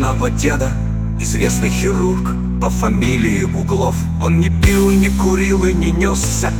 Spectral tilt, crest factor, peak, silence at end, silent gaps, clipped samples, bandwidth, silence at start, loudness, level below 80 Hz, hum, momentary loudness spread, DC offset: -5.5 dB/octave; 14 dB; -2 dBFS; 0 s; none; under 0.1%; 19 kHz; 0 s; -16 LUFS; -22 dBFS; none; 6 LU; under 0.1%